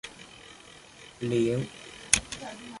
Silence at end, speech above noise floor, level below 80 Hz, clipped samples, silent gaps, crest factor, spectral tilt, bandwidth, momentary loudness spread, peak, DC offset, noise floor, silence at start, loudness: 0 s; 21 dB; -54 dBFS; under 0.1%; none; 30 dB; -3 dB/octave; 12 kHz; 23 LU; -2 dBFS; under 0.1%; -51 dBFS; 0.05 s; -28 LUFS